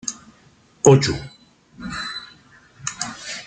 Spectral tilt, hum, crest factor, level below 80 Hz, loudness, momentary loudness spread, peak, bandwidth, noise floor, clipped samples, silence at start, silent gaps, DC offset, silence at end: -4.5 dB/octave; none; 22 dB; -50 dBFS; -21 LUFS; 25 LU; -2 dBFS; 9.4 kHz; -54 dBFS; under 0.1%; 0.05 s; none; under 0.1%; 0 s